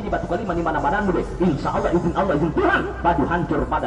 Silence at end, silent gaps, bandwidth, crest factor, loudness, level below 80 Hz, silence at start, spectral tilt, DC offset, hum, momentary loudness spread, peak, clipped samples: 0 s; none; 10.5 kHz; 14 dB; -21 LUFS; -34 dBFS; 0 s; -7.5 dB/octave; under 0.1%; none; 4 LU; -6 dBFS; under 0.1%